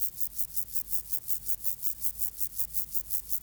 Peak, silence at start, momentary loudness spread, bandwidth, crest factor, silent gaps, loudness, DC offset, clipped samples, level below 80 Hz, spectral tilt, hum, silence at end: -12 dBFS; 0 s; 2 LU; over 20 kHz; 20 dB; none; -29 LUFS; under 0.1%; under 0.1%; -56 dBFS; -0.5 dB/octave; none; 0.05 s